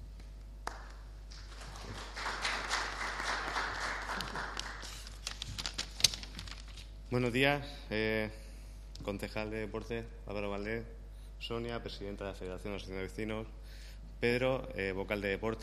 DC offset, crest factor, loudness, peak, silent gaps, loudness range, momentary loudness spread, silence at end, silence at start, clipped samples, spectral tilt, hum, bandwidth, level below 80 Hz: under 0.1%; 34 dB; -37 LUFS; -6 dBFS; none; 7 LU; 19 LU; 0 s; 0 s; under 0.1%; -3.5 dB/octave; none; 15 kHz; -48 dBFS